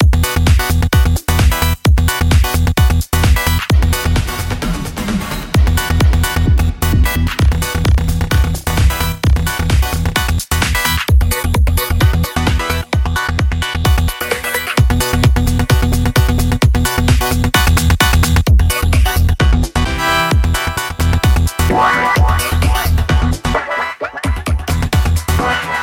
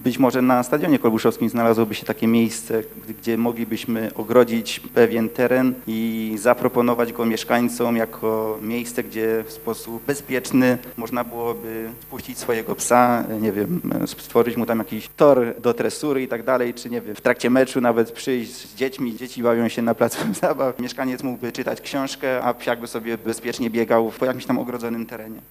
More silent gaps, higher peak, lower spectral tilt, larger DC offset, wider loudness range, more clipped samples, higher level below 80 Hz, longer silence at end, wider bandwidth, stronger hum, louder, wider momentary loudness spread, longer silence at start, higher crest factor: neither; about the same, 0 dBFS vs 0 dBFS; about the same, -5 dB/octave vs -5 dB/octave; neither; about the same, 3 LU vs 4 LU; neither; first, -16 dBFS vs -56 dBFS; about the same, 0 s vs 0.1 s; about the same, 17 kHz vs 16 kHz; neither; first, -14 LUFS vs -21 LUFS; second, 5 LU vs 10 LU; about the same, 0 s vs 0 s; second, 12 dB vs 20 dB